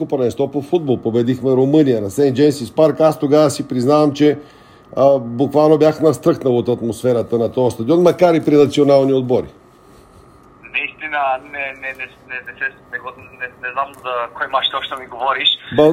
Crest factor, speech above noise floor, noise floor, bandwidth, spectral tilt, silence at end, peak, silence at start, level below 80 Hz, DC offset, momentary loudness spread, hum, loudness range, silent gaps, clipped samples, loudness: 16 dB; 30 dB; -45 dBFS; 16 kHz; -6 dB/octave; 0 s; 0 dBFS; 0 s; -56 dBFS; under 0.1%; 14 LU; none; 9 LU; none; under 0.1%; -16 LUFS